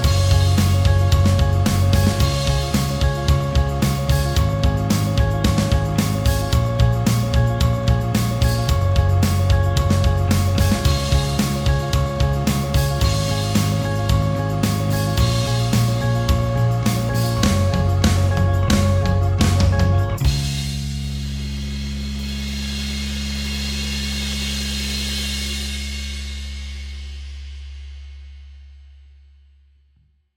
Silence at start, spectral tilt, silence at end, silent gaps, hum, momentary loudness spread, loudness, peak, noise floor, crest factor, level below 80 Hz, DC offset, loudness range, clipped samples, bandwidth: 0 s; -5.5 dB/octave; 1.55 s; none; none; 10 LU; -19 LUFS; -2 dBFS; -59 dBFS; 16 dB; -26 dBFS; under 0.1%; 8 LU; under 0.1%; over 20 kHz